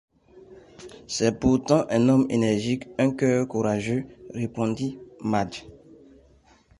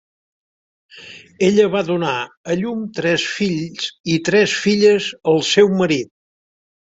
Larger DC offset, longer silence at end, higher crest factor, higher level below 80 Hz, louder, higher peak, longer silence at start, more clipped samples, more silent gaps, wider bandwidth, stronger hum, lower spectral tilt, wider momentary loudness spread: neither; first, 1.1 s vs 0.8 s; about the same, 20 dB vs 18 dB; first, -50 dBFS vs -58 dBFS; second, -24 LUFS vs -17 LUFS; second, -6 dBFS vs -2 dBFS; second, 0.35 s vs 0.95 s; neither; second, none vs 2.37-2.44 s, 4.00-4.04 s; first, 11.5 kHz vs 8 kHz; neither; first, -6 dB/octave vs -4.5 dB/octave; about the same, 13 LU vs 11 LU